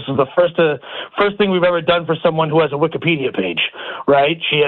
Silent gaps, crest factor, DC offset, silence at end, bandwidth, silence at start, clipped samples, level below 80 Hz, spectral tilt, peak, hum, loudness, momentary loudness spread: none; 14 dB; under 0.1%; 0 s; 4.3 kHz; 0 s; under 0.1%; -52 dBFS; -9 dB/octave; -4 dBFS; none; -16 LUFS; 5 LU